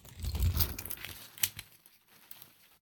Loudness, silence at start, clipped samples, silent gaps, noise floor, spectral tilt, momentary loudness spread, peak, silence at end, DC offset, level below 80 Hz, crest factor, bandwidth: -34 LUFS; 0.05 s; under 0.1%; none; -62 dBFS; -3 dB/octave; 20 LU; -8 dBFS; 0.4 s; under 0.1%; -42 dBFS; 28 dB; 19.5 kHz